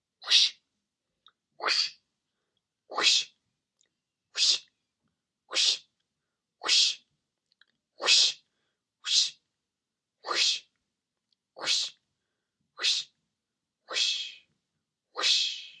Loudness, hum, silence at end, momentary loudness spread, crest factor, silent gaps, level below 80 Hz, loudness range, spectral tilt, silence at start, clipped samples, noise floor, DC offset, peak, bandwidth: -25 LUFS; none; 0.1 s; 17 LU; 26 dB; none; under -90 dBFS; 6 LU; 3.5 dB/octave; 0.2 s; under 0.1%; -88 dBFS; under 0.1%; -6 dBFS; 11.5 kHz